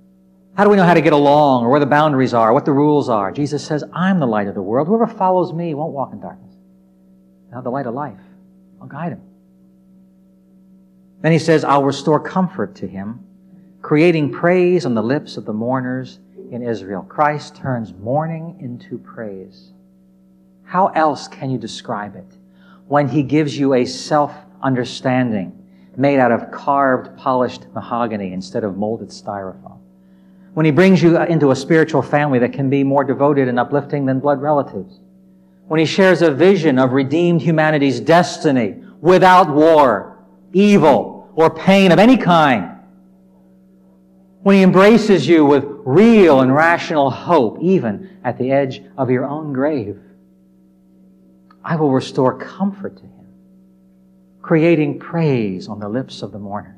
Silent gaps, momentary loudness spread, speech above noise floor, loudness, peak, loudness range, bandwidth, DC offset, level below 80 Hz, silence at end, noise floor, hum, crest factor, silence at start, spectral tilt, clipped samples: none; 17 LU; 36 dB; -15 LUFS; 0 dBFS; 10 LU; 12 kHz; under 0.1%; -56 dBFS; 0.15 s; -50 dBFS; none; 16 dB; 0.55 s; -7 dB/octave; under 0.1%